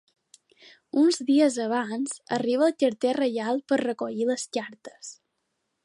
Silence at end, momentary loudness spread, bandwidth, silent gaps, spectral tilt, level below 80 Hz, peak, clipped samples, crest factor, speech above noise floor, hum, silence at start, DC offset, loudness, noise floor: 0.7 s; 16 LU; 11.5 kHz; none; -4 dB/octave; -78 dBFS; -10 dBFS; under 0.1%; 16 dB; 53 dB; none; 0.95 s; under 0.1%; -25 LUFS; -78 dBFS